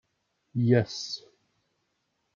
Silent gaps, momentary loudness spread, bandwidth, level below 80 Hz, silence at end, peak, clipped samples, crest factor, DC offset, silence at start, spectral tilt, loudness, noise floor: none; 13 LU; 7.4 kHz; -70 dBFS; 1.15 s; -8 dBFS; under 0.1%; 22 dB; under 0.1%; 0.55 s; -6.5 dB/octave; -28 LUFS; -77 dBFS